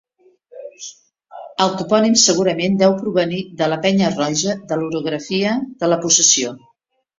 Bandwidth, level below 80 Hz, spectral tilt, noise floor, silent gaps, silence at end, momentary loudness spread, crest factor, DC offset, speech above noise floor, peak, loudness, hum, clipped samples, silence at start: 7.8 kHz; -60 dBFS; -3 dB/octave; -51 dBFS; none; 0.6 s; 18 LU; 18 dB; under 0.1%; 34 dB; 0 dBFS; -16 LUFS; none; under 0.1%; 0.55 s